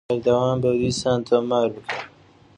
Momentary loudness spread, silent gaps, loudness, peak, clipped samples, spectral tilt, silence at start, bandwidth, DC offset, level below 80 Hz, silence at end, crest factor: 11 LU; none; -22 LUFS; -6 dBFS; under 0.1%; -5.5 dB/octave; 0.1 s; 10.5 kHz; under 0.1%; -52 dBFS; 0.5 s; 16 dB